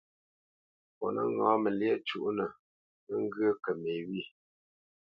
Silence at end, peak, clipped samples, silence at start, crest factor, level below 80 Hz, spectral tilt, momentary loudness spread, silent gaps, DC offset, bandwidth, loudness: 0.75 s; -12 dBFS; under 0.1%; 1 s; 22 dB; -78 dBFS; -8 dB/octave; 11 LU; 2.59-3.07 s; under 0.1%; 5.6 kHz; -33 LUFS